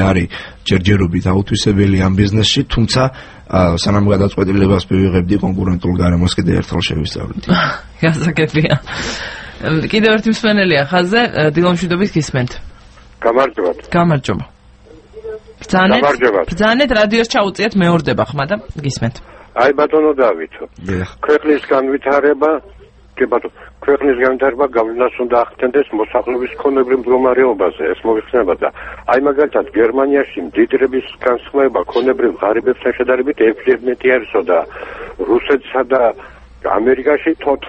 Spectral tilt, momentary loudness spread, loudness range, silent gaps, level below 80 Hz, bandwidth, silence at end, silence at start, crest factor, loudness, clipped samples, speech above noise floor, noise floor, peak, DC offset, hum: -6 dB/octave; 9 LU; 2 LU; none; -36 dBFS; 8.8 kHz; 0 s; 0 s; 14 dB; -14 LUFS; under 0.1%; 28 dB; -42 dBFS; 0 dBFS; under 0.1%; none